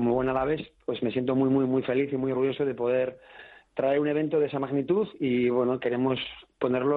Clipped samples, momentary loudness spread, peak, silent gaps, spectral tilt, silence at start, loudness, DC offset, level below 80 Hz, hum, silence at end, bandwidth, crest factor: under 0.1%; 7 LU; -14 dBFS; none; -10 dB/octave; 0 s; -27 LUFS; under 0.1%; -58 dBFS; none; 0 s; 4.5 kHz; 14 dB